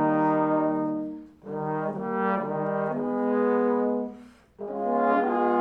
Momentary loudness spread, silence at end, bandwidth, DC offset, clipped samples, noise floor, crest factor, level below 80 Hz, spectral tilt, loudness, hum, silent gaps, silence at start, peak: 13 LU; 0 s; 5.2 kHz; under 0.1%; under 0.1%; -48 dBFS; 14 dB; -66 dBFS; -9.5 dB/octave; -26 LUFS; none; none; 0 s; -12 dBFS